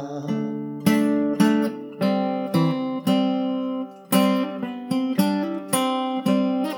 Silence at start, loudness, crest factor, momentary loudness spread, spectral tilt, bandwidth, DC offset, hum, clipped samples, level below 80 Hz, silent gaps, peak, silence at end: 0 s; -23 LUFS; 18 dB; 8 LU; -5.5 dB/octave; 19.5 kHz; under 0.1%; none; under 0.1%; -76 dBFS; none; -4 dBFS; 0 s